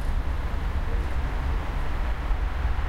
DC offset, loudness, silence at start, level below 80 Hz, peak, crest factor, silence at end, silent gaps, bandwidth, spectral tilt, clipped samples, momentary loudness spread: under 0.1%; -30 LUFS; 0 s; -26 dBFS; -12 dBFS; 12 dB; 0 s; none; 11.5 kHz; -6.5 dB/octave; under 0.1%; 2 LU